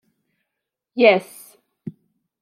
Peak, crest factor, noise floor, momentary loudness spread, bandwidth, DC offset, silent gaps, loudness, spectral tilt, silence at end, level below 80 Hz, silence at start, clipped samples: -2 dBFS; 22 dB; -82 dBFS; 23 LU; 16 kHz; under 0.1%; none; -17 LUFS; -5 dB/octave; 0.5 s; -78 dBFS; 0.95 s; under 0.1%